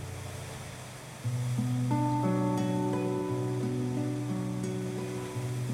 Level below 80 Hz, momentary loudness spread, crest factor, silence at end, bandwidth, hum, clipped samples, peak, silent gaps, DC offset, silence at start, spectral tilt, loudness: -60 dBFS; 12 LU; 14 dB; 0 s; 15.5 kHz; none; under 0.1%; -16 dBFS; none; under 0.1%; 0 s; -7 dB/octave; -32 LUFS